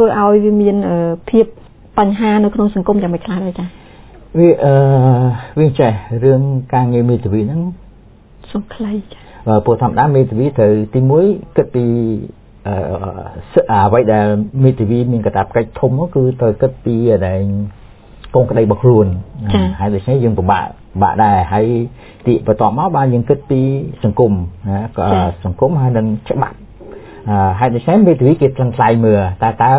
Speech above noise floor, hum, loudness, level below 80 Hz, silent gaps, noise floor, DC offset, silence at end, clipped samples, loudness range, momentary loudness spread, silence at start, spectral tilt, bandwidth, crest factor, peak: 29 dB; none; -14 LUFS; -34 dBFS; none; -41 dBFS; under 0.1%; 0 s; under 0.1%; 3 LU; 11 LU; 0 s; -12.5 dB/octave; 4 kHz; 14 dB; 0 dBFS